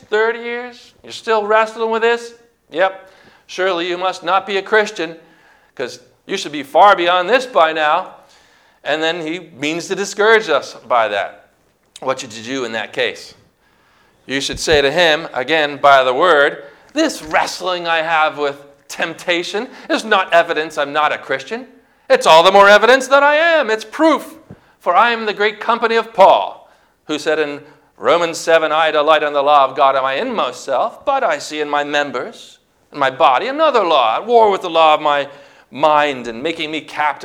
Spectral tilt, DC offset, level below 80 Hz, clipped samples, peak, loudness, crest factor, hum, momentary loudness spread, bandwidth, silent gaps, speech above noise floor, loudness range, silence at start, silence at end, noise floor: -3 dB/octave; under 0.1%; -54 dBFS; 0.2%; 0 dBFS; -15 LUFS; 16 dB; none; 14 LU; 16.5 kHz; none; 42 dB; 7 LU; 0.1 s; 0 s; -57 dBFS